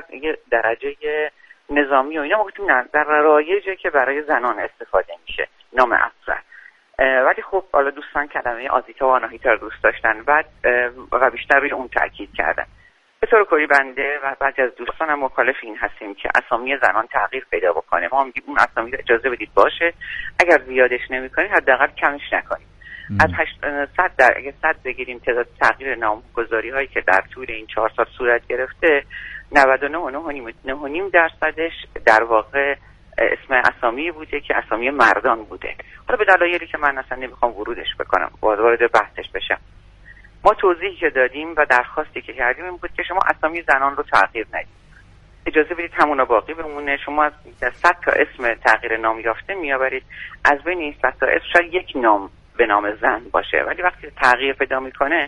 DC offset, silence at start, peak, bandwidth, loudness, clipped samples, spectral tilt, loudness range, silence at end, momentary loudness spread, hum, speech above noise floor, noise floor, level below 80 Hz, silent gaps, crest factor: under 0.1%; 0.1 s; 0 dBFS; 11 kHz; -19 LUFS; under 0.1%; -5 dB/octave; 2 LU; 0 s; 11 LU; none; 28 dB; -47 dBFS; -46 dBFS; none; 20 dB